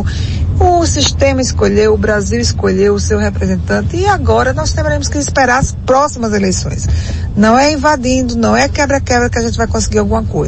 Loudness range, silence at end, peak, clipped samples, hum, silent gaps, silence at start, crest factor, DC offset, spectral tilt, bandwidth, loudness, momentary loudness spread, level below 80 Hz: 1 LU; 0 s; 0 dBFS; under 0.1%; none; none; 0 s; 12 dB; under 0.1%; -5 dB/octave; 8.6 kHz; -12 LUFS; 5 LU; -22 dBFS